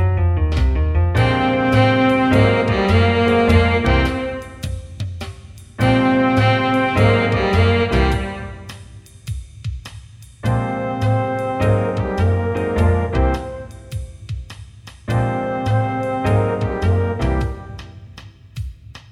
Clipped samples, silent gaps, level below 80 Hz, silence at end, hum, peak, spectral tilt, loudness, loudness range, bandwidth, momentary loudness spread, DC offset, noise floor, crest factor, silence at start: under 0.1%; none; -28 dBFS; 0.1 s; none; -2 dBFS; -7.5 dB/octave; -18 LUFS; 7 LU; 12 kHz; 18 LU; under 0.1%; -40 dBFS; 16 dB; 0 s